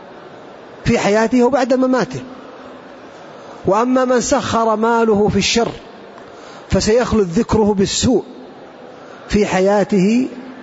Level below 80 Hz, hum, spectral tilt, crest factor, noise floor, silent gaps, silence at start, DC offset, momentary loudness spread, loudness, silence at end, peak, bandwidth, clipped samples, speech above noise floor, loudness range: -38 dBFS; none; -5 dB/octave; 14 dB; -37 dBFS; none; 0 s; under 0.1%; 23 LU; -15 LUFS; 0 s; -4 dBFS; 8 kHz; under 0.1%; 22 dB; 2 LU